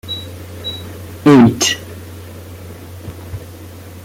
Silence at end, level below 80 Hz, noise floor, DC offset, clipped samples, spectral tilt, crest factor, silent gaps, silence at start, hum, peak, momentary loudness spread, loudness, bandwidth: 0.05 s; -48 dBFS; -33 dBFS; under 0.1%; under 0.1%; -4.5 dB/octave; 16 dB; none; 0.05 s; none; -2 dBFS; 25 LU; -14 LUFS; 17 kHz